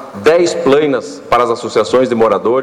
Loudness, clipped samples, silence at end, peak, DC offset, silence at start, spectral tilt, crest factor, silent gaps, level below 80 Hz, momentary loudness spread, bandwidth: -12 LUFS; under 0.1%; 0 s; -2 dBFS; under 0.1%; 0 s; -5 dB/octave; 10 dB; none; -50 dBFS; 4 LU; 12.5 kHz